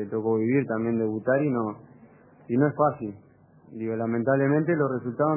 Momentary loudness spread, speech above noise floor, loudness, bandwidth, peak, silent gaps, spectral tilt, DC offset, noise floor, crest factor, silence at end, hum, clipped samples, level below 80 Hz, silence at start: 12 LU; 28 dB; -25 LUFS; 2.9 kHz; -8 dBFS; none; -14 dB/octave; under 0.1%; -53 dBFS; 16 dB; 0 s; none; under 0.1%; -66 dBFS; 0 s